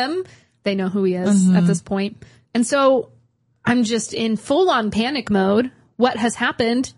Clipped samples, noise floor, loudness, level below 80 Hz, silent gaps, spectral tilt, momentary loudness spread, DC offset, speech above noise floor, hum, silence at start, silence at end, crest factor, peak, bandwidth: under 0.1%; -59 dBFS; -19 LUFS; -54 dBFS; none; -5.5 dB/octave; 10 LU; under 0.1%; 40 dB; none; 0 s; 0.05 s; 16 dB; -2 dBFS; 11.5 kHz